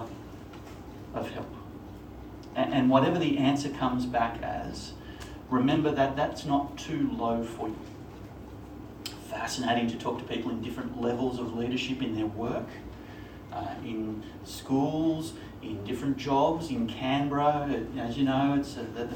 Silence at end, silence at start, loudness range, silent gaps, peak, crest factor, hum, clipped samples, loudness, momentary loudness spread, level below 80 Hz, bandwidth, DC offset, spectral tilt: 0 s; 0 s; 6 LU; none; -8 dBFS; 22 dB; none; under 0.1%; -30 LUFS; 19 LU; -52 dBFS; 17 kHz; under 0.1%; -6 dB/octave